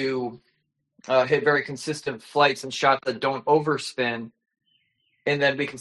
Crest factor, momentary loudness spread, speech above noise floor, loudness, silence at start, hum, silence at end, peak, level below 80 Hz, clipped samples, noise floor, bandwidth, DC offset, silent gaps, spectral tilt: 20 dB; 10 LU; 49 dB; -24 LUFS; 0 s; none; 0 s; -6 dBFS; -68 dBFS; under 0.1%; -73 dBFS; 11.5 kHz; under 0.1%; none; -4.5 dB/octave